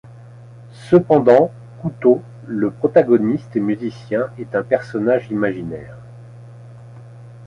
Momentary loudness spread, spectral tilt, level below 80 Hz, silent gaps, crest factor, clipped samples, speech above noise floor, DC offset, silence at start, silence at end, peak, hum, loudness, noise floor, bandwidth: 16 LU; -9 dB/octave; -56 dBFS; none; 18 dB; under 0.1%; 23 dB; under 0.1%; 0.05 s; 0 s; -2 dBFS; none; -18 LUFS; -40 dBFS; 9.8 kHz